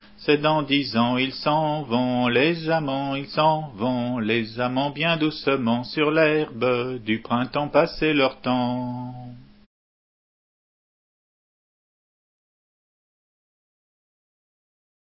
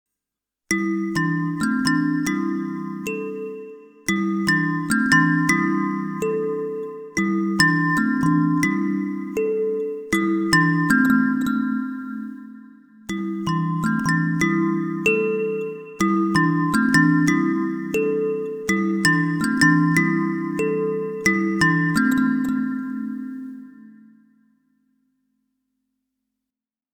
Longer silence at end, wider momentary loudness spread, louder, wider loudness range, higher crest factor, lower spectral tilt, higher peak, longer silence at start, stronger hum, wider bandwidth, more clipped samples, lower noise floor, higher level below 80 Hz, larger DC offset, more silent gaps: first, 5.65 s vs 3.05 s; second, 6 LU vs 12 LU; about the same, -23 LUFS vs -21 LUFS; about the same, 5 LU vs 5 LU; about the same, 20 dB vs 20 dB; first, -10 dB/octave vs -5.5 dB/octave; about the same, -4 dBFS vs -2 dBFS; second, 0.2 s vs 0.7 s; neither; second, 5.8 kHz vs 19.5 kHz; neither; about the same, under -90 dBFS vs -87 dBFS; about the same, -56 dBFS vs -56 dBFS; neither; neither